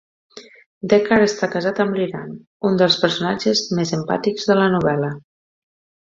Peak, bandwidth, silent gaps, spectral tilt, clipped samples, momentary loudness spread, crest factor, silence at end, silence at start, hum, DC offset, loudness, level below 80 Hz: -2 dBFS; 7.6 kHz; 0.66-0.81 s, 2.47-2.60 s; -5 dB/octave; under 0.1%; 11 LU; 18 dB; 0.85 s; 0.35 s; none; under 0.1%; -18 LUFS; -56 dBFS